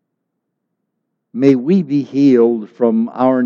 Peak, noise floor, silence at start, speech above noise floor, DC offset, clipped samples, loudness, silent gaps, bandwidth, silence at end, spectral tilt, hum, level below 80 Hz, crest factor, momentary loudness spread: 0 dBFS; -74 dBFS; 1.35 s; 61 dB; under 0.1%; under 0.1%; -14 LUFS; none; 7 kHz; 0 s; -9 dB/octave; none; -64 dBFS; 16 dB; 6 LU